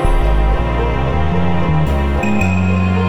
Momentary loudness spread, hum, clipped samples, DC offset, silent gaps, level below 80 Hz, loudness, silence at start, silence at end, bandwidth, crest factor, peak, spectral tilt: 2 LU; none; under 0.1%; under 0.1%; none; -18 dBFS; -16 LUFS; 0 s; 0 s; 11 kHz; 12 dB; -2 dBFS; -7.5 dB/octave